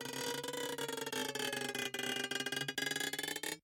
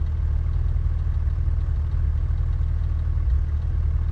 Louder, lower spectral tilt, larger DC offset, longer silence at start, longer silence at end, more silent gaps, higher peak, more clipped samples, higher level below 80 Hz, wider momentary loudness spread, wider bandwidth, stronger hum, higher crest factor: second, -38 LUFS vs -25 LUFS; second, -1.5 dB/octave vs -9.5 dB/octave; neither; about the same, 0 s vs 0 s; about the same, 0.05 s vs 0 s; neither; second, -22 dBFS vs -12 dBFS; neither; second, -82 dBFS vs -24 dBFS; about the same, 3 LU vs 1 LU; first, 17 kHz vs 3.9 kHz; neither; first, 18 dB vs 10 dB